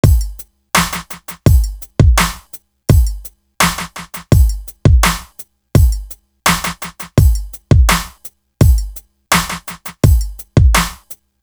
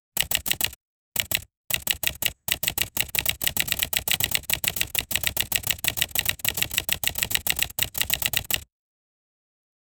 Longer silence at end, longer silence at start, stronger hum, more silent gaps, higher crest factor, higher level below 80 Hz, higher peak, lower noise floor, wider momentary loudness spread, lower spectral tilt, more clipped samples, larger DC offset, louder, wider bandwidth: second, 0.3 s vs 1.35 s; about the same, 0.05 s vs 0.15 s; neither; second, none vs 0.76-1.12 s, 1.57-1.64 s; second, 14 dB vs 28 dB; first, -18 dBFS vs -46 dBFS; about the same, 0 dBFS vs 0 dBFS; second, -39 dBFS vs under -90 dBFS; first, 20 LU vs 4 LU; first, -4.5 dB/octave vs -0.5 dB/octave; neither; neither; first, -15 LUFS vs -24 LUFS; about the same, over 20 kHz vs over 20 kHz